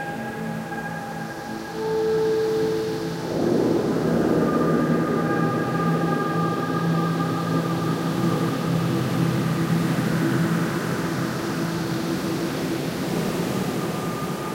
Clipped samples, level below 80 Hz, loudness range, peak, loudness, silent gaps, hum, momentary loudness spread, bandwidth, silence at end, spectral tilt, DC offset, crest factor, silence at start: under 0.1%; -52 dBFS; 4 LU; -10 dBFS; -24 LUFS; none; none; 8 LU; 16 kHz; 0 s; -6.5 dB/octave; under 0.1%; 14 dB; 0 s